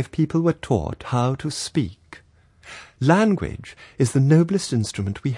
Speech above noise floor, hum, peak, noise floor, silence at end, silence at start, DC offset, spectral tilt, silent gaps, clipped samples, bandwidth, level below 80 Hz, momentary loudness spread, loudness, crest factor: 32 dB; none; -4 dBFS; -53 dBFS; 0 s; 0 s; under 0.1%; -6.5 dB/octave; none; under 0.1%; 11.5 kHz; -48 dBFS; 18 LU; -21 LUFS; 18 dB